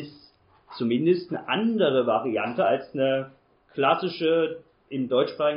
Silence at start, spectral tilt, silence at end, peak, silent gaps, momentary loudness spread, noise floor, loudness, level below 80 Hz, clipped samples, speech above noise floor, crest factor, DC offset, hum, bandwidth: 0 s; -4 dB/octave; 0 s; -6 dBFS; none; 14 LU; -58 dBFS; -25 LUFS; -70 dBFS; under 0.1%; 34 dB; 18 dB; under 0.1%; none; 5.4 kHz